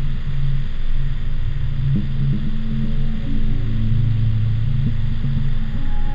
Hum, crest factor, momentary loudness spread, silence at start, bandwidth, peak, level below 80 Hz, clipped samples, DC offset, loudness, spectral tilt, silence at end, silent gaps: none; 10 dB; 7 LU; 0 s; 4.6 kHz; -6 dBFS; -18 dBFS; under 0.1%; under 0.1%; -23 LUFS; -9 dB/octave; 0 s; none